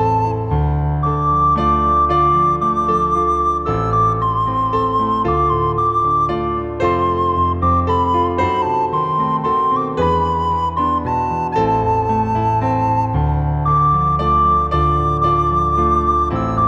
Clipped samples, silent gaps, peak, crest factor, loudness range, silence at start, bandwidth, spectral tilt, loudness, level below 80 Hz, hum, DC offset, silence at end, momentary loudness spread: under 0.1%; none; -4 dBFS; 12 dB; 2 LU; 0 s; 8.4 kHz; -8.5 dB/octave; -16 LUFS; -28 dBFS; none; under 0.1%; 0 s; 4 LU